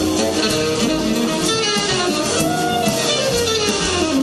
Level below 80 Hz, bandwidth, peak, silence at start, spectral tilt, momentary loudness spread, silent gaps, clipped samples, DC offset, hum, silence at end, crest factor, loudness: -42 dBFS; 14 kHz; -4 dBFS; 0 s; -3 dB/octave; 1 LU; none; under 0.1%; under 0.1%; none; 0 s; 14 dB; -17 LUFS